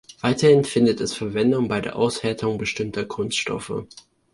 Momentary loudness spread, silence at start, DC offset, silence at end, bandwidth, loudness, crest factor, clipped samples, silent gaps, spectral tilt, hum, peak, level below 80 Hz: 11 LU; 0.1 s; under 0.1%; 0.5 s; 11.5 kHz; -22 LUFS; 18 dB; under 0.1%; none; -5 dB/octave; none; -4 dBFS; -54 dBFS